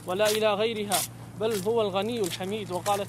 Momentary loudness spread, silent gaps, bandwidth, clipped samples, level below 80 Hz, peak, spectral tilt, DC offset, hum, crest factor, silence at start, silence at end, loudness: 8 LU; none; 16 kHz; under 0.1%; -60 dBFS; -8 dBFS; -3.5 dB/octave; under 0.1%; none; 18 dB; 0 s; 0 s; -27 LUFS